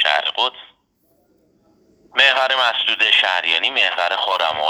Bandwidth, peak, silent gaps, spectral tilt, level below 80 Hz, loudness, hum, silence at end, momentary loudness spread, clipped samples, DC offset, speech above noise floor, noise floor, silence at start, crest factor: 20 kHz; 0 dBFS; none; 0 dB/octave; -68 dBFS; -16 LUFS; none; 0 s; 7 LU; under 0.1%; under 0.1%; 44 dB; -62 dBFS; 0 s; 20 dB